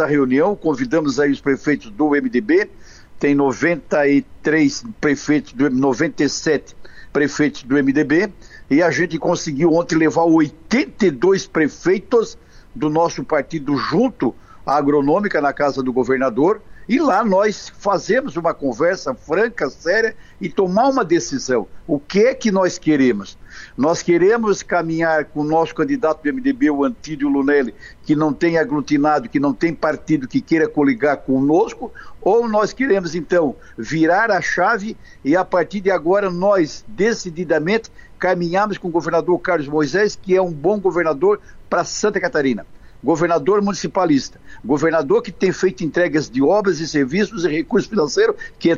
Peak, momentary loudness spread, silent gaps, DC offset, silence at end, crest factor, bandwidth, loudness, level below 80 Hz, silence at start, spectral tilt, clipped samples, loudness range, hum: -6 dBFS; 6 LU; none; under 0.1%; 0 s; 12 dB; 7.6 kHz; -18 LUFS; -48 dBFS; 0 s; -5.5 dB/octave; under 0.1%; 2 LU; none